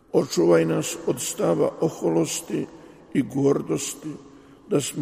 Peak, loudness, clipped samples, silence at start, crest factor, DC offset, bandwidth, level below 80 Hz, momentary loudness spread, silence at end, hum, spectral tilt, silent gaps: -6 dBFS; -24 LUFS; under 0.1%; 0.15 s; 18 dB; under 0.1%; 15.5 kHz; -62 dBFS; 11 LU; 0 s; none; -5 dB/octave; none